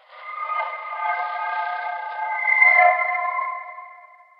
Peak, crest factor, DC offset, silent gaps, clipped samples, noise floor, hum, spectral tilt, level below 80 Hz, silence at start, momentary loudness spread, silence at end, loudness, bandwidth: -4 dBFS; 20 dB; under 0.1%; none; under 0.1%; -47 dBFS; none; 1 dB/octave; under -90 dBFS; 0.1 s; 18 LU; 0.35 s; -20 LUFS; 5.4 kHz